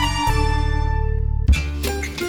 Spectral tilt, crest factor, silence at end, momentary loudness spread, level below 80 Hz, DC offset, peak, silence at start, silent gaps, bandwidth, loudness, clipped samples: -5 dB/octave; 14 dB; 0 s; 5 LU; -20 dBFS; under 0.1%; -6 dBFS; 0 s; none; 19 kHz; -21 LUFS; under 0.1%